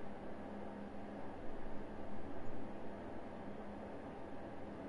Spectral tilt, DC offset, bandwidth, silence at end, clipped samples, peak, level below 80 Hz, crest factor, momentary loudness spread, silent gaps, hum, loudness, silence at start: -7.5 dB/octave; under 0.1%; 10.5 kHz; 0 s; under 0.1%; -30 dBFS; -56 dBFS; 14 dB; 1 LU; none; none; -50 LUFS; 0 s